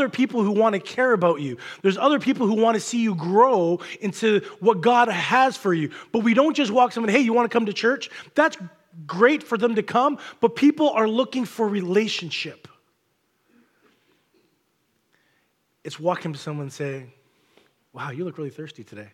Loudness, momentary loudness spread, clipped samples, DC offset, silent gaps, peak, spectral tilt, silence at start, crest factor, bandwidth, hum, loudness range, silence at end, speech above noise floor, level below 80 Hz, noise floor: -21 LUFS; 14 LU; under 0.1%; under 0.1%; none; -4 dBFS; -5.5 dB/octave; 0 s; 18 dB; 14 kHz; none; 13 LU; 0.1 s; 48 dB; -78 dBFS; -70 dBFS